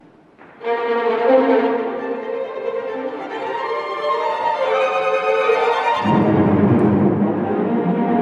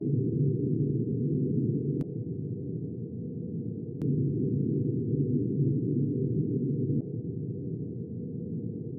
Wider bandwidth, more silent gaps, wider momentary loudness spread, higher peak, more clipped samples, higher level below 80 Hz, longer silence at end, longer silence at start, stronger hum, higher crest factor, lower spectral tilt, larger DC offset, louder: first, 8.4 kHz vs 1 kHz; neither; about the same, 10 LU vs 8 LU; first, -2 dBFS vs -16 dBFS; neither; about the same, -60 dBFS vs -64 dBFS; about the same, 0 s vs 0 s; first, 0.4 s vs 0 s; neither; about the same, 16 dB vs 14 dB; second, -8 dB/octave vs -16.5 dB/octave; neither; first, -18 LUFS vs -31 LUFS